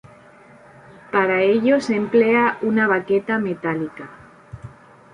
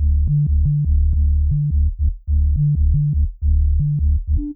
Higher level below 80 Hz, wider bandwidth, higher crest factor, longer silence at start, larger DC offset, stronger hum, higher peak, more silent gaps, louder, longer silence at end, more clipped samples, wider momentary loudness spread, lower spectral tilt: second, -58 dBFS vs -18 dBFS; first, 10.5 kHz vs 0.5 kHz; first, 16 dB vs 8 dB; first, 1.1 s vs 0 s; neither; neither; first, -4 dBFS vs -8 dBFS; neither; about the same, -19 LUFS vs -19 LUFS; first, 0.45 s vs 0 s; neither; first, 22 LU vs 3 LU; second, -6.5 dB/octave vs -17.5 dB/octave